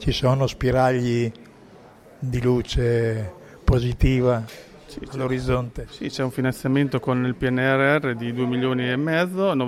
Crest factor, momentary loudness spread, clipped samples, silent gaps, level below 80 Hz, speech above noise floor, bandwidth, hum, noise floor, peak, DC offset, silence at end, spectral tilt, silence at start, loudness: 16 dB; 12 LU; under 0.1%; none; -34 dBFS; 26 dB; 14.5 kHz; none; -47 dBFS; -6 dBFS; under 0.1%; 0 s; -7 dB/octave; 0 s; -22 LUFS